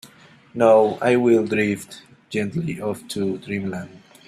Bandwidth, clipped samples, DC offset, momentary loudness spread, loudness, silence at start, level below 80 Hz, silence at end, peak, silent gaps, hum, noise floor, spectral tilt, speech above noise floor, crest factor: 14 kHz; under 0.1%; under 0.1%; 16 LU; -21 LUFS; 0.05 s; -62 dBFS; 0.3 s; -2 dBFS; none; none; -49 dBFS; -6.5 dB/octave; 29 dB; 18 dB